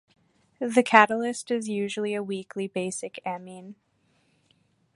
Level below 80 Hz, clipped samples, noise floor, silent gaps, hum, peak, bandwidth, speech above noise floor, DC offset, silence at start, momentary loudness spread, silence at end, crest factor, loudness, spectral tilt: -76 dBFS; under 0.1%; -68 dBFS; none; none; 0 dBFS; 11.5 kHz; 42 dB; under 0.1%; 0.6 s; 16 LU; 1.25 s; 28 dB; -25 LUFS; -4 dB/octave